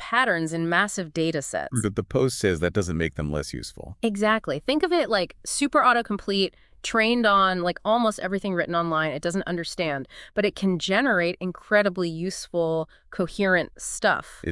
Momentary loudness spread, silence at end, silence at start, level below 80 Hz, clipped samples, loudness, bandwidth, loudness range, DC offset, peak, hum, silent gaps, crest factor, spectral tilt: 9 LU; 0 s; 0 s; -50 dBFS; under 0.1%; -24 LUFS; 12 kHz; 3 LU; under 0.1%; -6 dBFS; none; none; 18 dB; -4.5 dB/octave